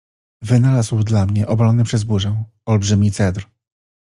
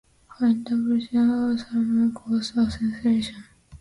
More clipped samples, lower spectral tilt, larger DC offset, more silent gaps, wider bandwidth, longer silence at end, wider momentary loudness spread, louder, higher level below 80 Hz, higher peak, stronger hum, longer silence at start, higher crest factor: neither; about the same, -6.5 dB/octave vs -6 dB/octave; neither; neither; about the same, 11 kHz vs 11 kHz; first, 0.6 s vs 0.05 s; first, 7 LU vs 4 LU; first, -17 LUFS vs -24 LUFS; about the same, -48 dBFS vs -50 dBFS; first, -2 dBFS vs -12 dBFS; neither; about the same, 0.4 s vs 0.4 s; about the same, 14 dB vs 12 dB